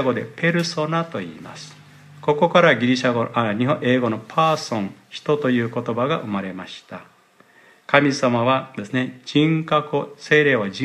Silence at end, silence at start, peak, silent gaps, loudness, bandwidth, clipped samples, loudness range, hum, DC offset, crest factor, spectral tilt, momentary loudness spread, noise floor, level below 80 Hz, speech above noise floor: 0 s; 0 s; 0 dBFS; none; -20 LUFS; 12 kHz; under 0.1%; 4 LU; none; under 0.1%; 20 dB; -6 dB/octave; 17 LU; -54 dBFS; -68 dBFS; 34 dB